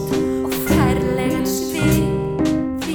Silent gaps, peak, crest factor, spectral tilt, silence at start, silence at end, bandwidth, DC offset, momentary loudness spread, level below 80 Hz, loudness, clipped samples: none; -4 dBFS; 14 dB; -6 dB/octave; 0 s; 0 s; over 20 kHz; under 0.1%; 4 LU; -34 dBFS; -19 LUFS; under 0.1%